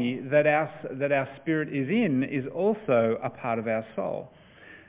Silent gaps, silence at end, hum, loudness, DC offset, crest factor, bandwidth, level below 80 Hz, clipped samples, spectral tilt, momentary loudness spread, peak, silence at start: none; 0.1 s; none; -27 LUFS; under 0.1%; 18 dB; 3.9 kHz; -66 dBFS; under 0.1%; -10.5 dB/octave; 9 LU; -10 dBFS; 0 s